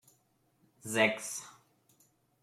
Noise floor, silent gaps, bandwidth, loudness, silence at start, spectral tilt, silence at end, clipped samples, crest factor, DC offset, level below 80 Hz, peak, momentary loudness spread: -73 dBFS; none; 16.5 kHz; -32 LUFS; 0.85 s; -2.5 dB/octave; 0.9 s; under 0.1%; 24 dB; under 0.1%; -82 dBFS; -14 dBFS; 21 LU